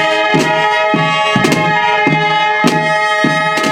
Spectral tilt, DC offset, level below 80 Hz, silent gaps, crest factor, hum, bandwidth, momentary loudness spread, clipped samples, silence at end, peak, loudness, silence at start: -4.5 dB/octave; under 0.1%; -50 dBFS; none; 12 dB; none; 17.5 kHz; 1 LU; under 0.1%; 0 s; 0 dBFS; -11 LUFS; 0 s